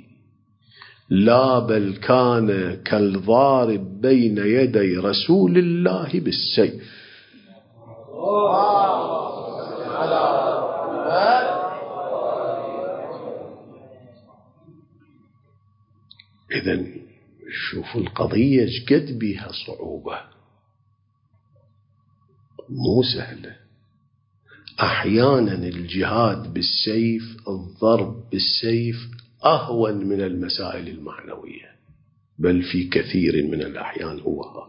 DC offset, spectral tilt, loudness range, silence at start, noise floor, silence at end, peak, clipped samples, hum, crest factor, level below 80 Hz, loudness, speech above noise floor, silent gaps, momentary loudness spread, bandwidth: under 0.1%; -10.5 dB/octave; 13 LU; 0.85 s; -64 dBFS; 0.05 s; -2 dBFS; under 0.1%; none; 20 dB; -50 dBFS; -21 LUFS; 44 dB; none; 15 LU; 5.6 kHz